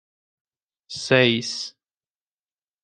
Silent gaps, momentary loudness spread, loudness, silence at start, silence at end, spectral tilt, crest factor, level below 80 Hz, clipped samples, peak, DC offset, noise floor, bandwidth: none; 18 LU; -20 LUFS; 0.9 s; 1.15 s; -4 dB/octave; 24 dB; -66 dBFS; under 0.1%; -2 dBFS; under 0.1%; under -90 dBFS; 10 kHz